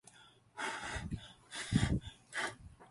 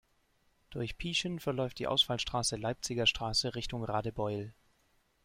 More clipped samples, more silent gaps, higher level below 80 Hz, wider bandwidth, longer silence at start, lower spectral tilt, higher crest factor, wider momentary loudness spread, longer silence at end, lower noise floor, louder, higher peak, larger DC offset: neither; neither; about the same, -50 dBFS vs -54 dBFS; second, 11.5 kHz vs 16 kHz; second, 0.15 s vs 0.7 s; about the same, -4.5 dB/octave vs -3.5 dB/octave; about the same, 22 dB vs 20 dB; first, 17 LU vs 12 LU; second, 0.05 s vs 0.7 s; second, -62 dBFS vs -72 dBFS; second, -39 LUFS vs -33 LUFS; about the same, -18 dBFS vs -16 dBFS; neither